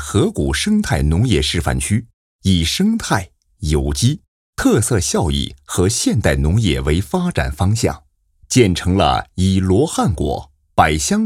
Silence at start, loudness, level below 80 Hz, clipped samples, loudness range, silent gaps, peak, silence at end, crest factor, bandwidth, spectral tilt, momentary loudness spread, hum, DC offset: 0 s; -17 LUFS; -30 dBFS; under 0.1%; 1 LU; 2.13-2.39 s, 4.28-4.53 s; 0 dBFS; 0 s; 16 dB; 16 kHz; -5 dB/octave; 7 LU; none; under 0.1%